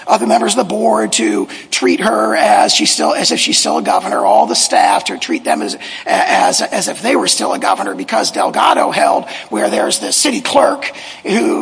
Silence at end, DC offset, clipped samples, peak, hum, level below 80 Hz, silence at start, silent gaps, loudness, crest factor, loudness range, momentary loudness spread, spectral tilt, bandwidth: 0 s; under 0.1%; 0.1%; 0 dBFS; none; -60 dBFS; 0 s; none; -13 LUFS; 14 dB; 3 LU; 7 LU; -2 dB/octave; 11 kHz